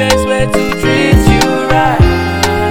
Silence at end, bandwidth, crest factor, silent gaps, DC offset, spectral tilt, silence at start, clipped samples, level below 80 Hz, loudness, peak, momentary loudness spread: 0 s; 19 kHz; 10 dB; none; under 0.1%; -5.5 dB/octave; 0 s; 0.2%; -18 dBFS; -11 LUFS; 0 dBFS; 4 LU